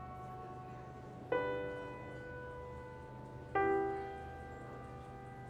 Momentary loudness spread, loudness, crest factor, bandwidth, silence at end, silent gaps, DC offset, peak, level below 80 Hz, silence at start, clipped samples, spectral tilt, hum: 15 LU; -42 LUFS; 20 dB; 10.5 kHz; 0 s; none; under 0.1%; -22 dBFS; -60 dBFS; 0 s; under 0.1%; -7.5 dB/octave; none